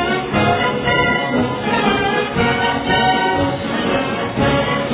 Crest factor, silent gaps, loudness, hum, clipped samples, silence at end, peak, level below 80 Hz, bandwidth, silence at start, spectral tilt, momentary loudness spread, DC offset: 14 dB; none; -17 LUFS; none; under 0.1%; 0 s; -2 dBFS; -38 dBFS; 4 kHz; 0 s; -9 dB/octave; 4 LU; under 0.1%